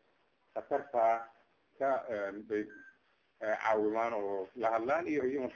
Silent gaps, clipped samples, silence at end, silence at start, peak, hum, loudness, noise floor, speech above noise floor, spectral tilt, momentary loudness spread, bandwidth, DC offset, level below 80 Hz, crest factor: none; under 0.1%; 0 s; 0.55 s; -18 dBFS; none; -34 LUFS; -73 dBFS; 40 dB; -6 dB/octave; 10 LU; 7 kHz; under 0.1%; -74 dBFS; 18 dB